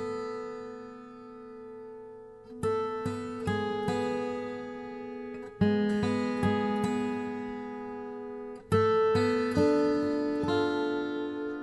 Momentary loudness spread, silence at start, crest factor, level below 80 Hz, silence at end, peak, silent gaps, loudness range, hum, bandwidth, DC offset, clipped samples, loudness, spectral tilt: 19 LU; 0 s; 18 dB; -60 dBFS; 0 s; -14 dBFS; none; 8 LU; none; 11.5 kHz; under 0.1%; under 0.1%; -30 LUFS; -7 dB/octave